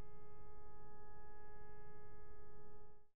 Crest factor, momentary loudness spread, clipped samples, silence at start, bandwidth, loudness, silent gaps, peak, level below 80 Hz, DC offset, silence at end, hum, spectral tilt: 12 dB; 2 LU; under 0.1%; 0 s; 3 kHz; -63 LUFS; none; -38 dBFS; -66 dBFS; 0.9%; 0 s; none; -4 dB/octave